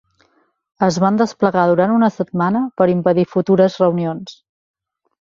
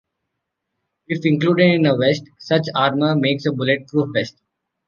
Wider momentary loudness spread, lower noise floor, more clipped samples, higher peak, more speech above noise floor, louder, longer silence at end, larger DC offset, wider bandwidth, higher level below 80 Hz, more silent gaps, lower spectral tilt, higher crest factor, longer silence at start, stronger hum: second, 6 LU vs 9 LU; second, -61 dBFS vs -78 dBFS; neither; about the same, -2 dBFS vs -2 dBFS; second, 45 dB vs 60 dB; about the same, -16 LUFS vs -18 LUFS; first, 0.9 s vs 0.6 s; neither; about the same, 7.6 kHz vs 7.2 kHz; about the same, -58 dBFS vs -62 dBFS; neither; about the same, -7.5 dB/octave vs -7 dB/octave; about the same, 14 dB vs 16 dB; second, 0.8 s vs 1.1 s; neither